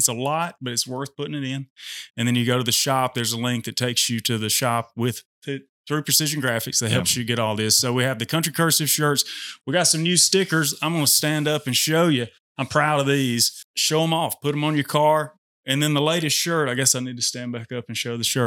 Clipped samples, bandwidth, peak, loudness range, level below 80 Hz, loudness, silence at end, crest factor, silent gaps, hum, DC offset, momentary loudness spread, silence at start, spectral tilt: under 0.1%; 18.5 kHz; -2 dBFS; 4 LU; -68 dBFS; -21 LUFS; 0 s; 20 dB; 1.70-1.76 s, 2.10-2.14 s, 5.25-5.42 s, 5.69-5.84 s, 12.40-12.55 s, 13.64-13.74 s, 15.38-15.63 s; none; under 0.1%; 12 LU; 0 s; -3 dB/octave